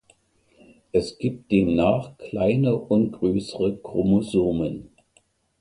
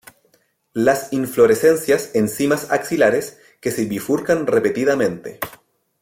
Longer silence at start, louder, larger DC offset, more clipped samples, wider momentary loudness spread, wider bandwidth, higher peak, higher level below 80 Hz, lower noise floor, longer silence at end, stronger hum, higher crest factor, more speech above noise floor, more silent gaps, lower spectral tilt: first, 0.95 s vs 0.75 s; second, -23 LUFS vs -18 LUFS; neither; neither; second, 8 LU vs 13 LU; second, 11 kHz vs 16.5 kHz; second, -6 dBFS vs -2 dBFS; first, -48 dBFS vs -58 dBFS; about the same, -63 dBFS vs -61 dBFS; first, 0.75 s vs 0.45 s; neither; about the same, 18 dB vs 16 dB; about the same, 41 dB vs 44 dB; neither; first, -8 dB/octave vs -5 dB/octave